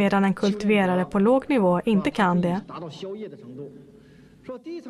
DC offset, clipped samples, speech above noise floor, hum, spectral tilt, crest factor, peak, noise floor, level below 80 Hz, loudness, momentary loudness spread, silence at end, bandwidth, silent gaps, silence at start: under 0.1%; under 0.1%; 28 dB; none; -7.5 dB/octave; 14 dB; -8 dBFS; -51 dBFS; -56 dBFS; -22 LUFS; 19 LU; 0 s; 12 kHz; none; 0 s